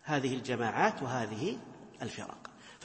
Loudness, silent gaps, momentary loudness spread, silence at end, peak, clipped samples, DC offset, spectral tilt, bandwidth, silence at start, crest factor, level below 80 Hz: -34 LUFS; none; 18 LU; 0 s; -12 dBFS; under 0.1%; under 0.1%; -5 dB/octave; 8.4 kHz; 0.05 s; 22 dB; -72 dBFS